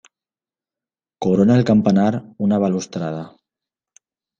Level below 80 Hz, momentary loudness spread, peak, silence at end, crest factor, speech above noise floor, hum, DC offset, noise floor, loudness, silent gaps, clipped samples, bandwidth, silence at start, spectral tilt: -58 dBFS; 13 LU; -4 dBFS; 1.1 s; 16 dB; over 73 dB; none; under 0.1%; under -90 dBFS; -18 LUFS; none; under 0.1%; 7.4 kHz; 1.2 s; -7.5 dB/octave